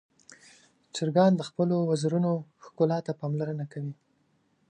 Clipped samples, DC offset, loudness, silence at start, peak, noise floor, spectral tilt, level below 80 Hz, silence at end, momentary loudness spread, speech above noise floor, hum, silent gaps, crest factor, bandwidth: under 0.1%; under 0.1%; -28 LUFS; 0.3 s; -8 dBFS; -70 dBFS; -7 dB/octave; -74 dBFS; 0.75 s; 13 LU; 43 dB; none; none; 20 dB; 9.8 kHz